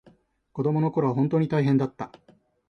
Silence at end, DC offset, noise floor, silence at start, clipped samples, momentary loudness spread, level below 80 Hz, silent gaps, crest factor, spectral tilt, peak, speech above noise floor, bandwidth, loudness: 0.65 s; under 0.1%; -59 dBFS; 0.55 s; under 0.1%; 16 LU; -64 dBFS; none; 14 dB; -10 dB/octave; -10 dBFS; 35 dB; 6.4 kHz; -24 LUFS